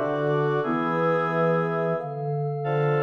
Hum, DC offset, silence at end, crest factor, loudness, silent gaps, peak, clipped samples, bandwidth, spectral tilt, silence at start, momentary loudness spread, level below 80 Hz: none; under 0.1%; 0 s; 12 dB; -25 LUFS; none; -14 dBFS; under 0.1%; 6.2 kHz; -9 dB/octave; 0 s; 5 LU; -70 dBFS